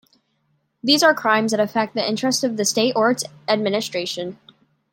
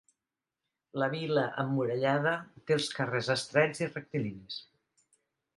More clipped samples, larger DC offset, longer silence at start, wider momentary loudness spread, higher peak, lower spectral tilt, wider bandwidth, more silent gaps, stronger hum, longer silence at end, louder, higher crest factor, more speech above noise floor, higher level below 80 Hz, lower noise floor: neither; neither; about the same, 0.85 s vs 0.95 s; about the same, 10 LU vs 10 LU; first, -2 dBFS vs -12 dBFS; second, -3 dB/octave vs -5 dB/octave; first, 16.5 kHz vs 11.5 kHz; neither; neither; second, 0.6 s vs 0.95 s; first, -20 LUFS vs -31 LUFS; about the same, 18 dB vs 22 dB; second, 48 dB vs 59 dB; about the same, -70 dBFS vs -74 dBFS; second, -68 dBFS vs -90 dBFS